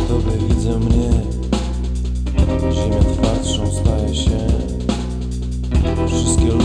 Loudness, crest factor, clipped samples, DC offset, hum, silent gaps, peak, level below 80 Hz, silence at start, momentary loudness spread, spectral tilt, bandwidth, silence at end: -19 LUFS; 14 dB; under 0.1%; under 0.1%; none; none; -2 dBFS; -20 dBFS; 0 s; 6 LU; -6 dB/octave; 10.5 kHz; 0 s